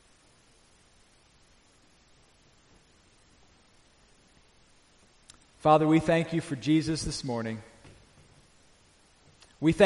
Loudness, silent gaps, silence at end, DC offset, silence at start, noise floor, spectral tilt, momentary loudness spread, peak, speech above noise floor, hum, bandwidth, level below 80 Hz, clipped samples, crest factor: -27 LUFS; none; 0 s; under 0.1%; 5.65 s; -62 dBFS; -6 dB/octave; 12 LU; -8 dBFS; 36 dB; none; 11.5 kHz; -56 dBFS; under 0.1%; 24 dB